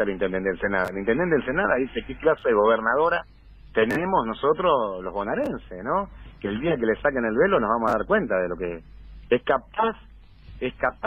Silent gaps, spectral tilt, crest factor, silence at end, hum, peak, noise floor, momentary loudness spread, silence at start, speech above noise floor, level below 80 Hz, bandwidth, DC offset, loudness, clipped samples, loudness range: none; -7 dB/octave; 16 dB; 0 s; none; -8 dBFS; -45 dBFS; 10 LU; 0 s; 22 dB; -46 dBFS; 10.5 kHz; under 0.1%; -24 LUFS; under 0.1%; 2 LU